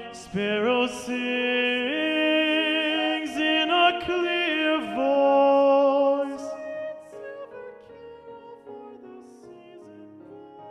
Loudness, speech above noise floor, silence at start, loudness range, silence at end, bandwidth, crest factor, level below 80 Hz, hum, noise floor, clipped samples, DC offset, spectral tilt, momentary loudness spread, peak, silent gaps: -23 LUFS; 21 dB; 0 s; 19 LU; 0 s; 12 kHz; 18 dB; -64 dBFS; none; -47 dBFS; under 0.1%; under 0.1%; -4 dB/octave; 24 LU; -8 dBFS; none